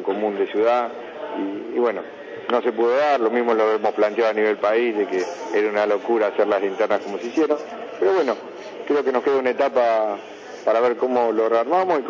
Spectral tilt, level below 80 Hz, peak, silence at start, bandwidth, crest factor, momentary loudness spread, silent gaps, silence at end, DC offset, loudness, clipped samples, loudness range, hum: -5 dB/octave; -74 dBFS; -6 dBFS; 0 s; 7.4 kHz; 14 dB; 10 LU; none; 0 s; under 0.1%; -21 LUFS; under 0.1%; 2 LU; none